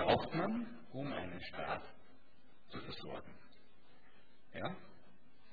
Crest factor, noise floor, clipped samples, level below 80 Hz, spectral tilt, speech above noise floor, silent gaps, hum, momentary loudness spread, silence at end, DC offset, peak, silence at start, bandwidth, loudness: 24 dB; -69 dBFS; under 0.1%; -66 dBFS; -4 dB/octave; 26 dB; none; none; 19 LU; 0.6 s; 0.4%; -18 dBFS; 0 s; 5 kHz; -43 LUFS